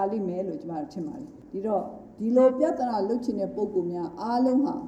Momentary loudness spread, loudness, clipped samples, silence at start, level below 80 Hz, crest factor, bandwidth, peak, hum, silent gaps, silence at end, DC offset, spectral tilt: 14 LU; -27 LUFS; under 0.1%; 0 s; -62 dBFS; 16 dB; 8.6 kHz; -10 dBFS; none; none; 0 s; under 0.1%; -8 dB/octave